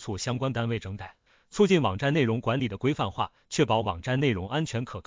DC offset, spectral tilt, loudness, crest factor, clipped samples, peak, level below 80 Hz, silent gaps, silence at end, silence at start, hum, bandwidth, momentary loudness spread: under 0.1%; -6 dB/octave; -27 LUFS; 18 dB; under 0.1%; -8 dBFS; -50 dBFS; none; 0.05 s; 0 s; none; 7.6 kHz; 10 LU